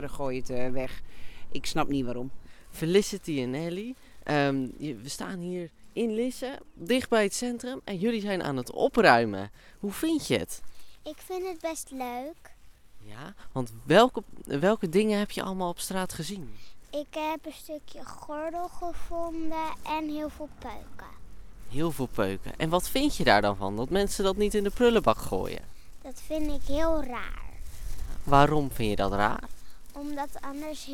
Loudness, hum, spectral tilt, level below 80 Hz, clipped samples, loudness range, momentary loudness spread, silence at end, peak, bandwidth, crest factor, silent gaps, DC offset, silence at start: -29 LUFS; none; -5 dB/octave; -42 dBFS; under 0.1%; 9 LU; 20 LU; 0 s; -4 dBFS; 17.5 kHz; 24 dB; none; under 0.1%; 0 s